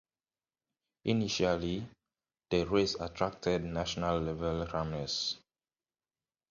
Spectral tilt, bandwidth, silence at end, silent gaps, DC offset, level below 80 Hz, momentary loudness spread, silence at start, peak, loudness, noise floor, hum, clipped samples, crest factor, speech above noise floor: -5 dB/octave; 7.4 kHz; 1.1 s; none; under 0.1%; -52 dBFS; 7 LU; 1.05 s; -14 dBFS; -33 LUFS; under -90 dBFS; none; under 0.1%; 22 dB; over 57 dB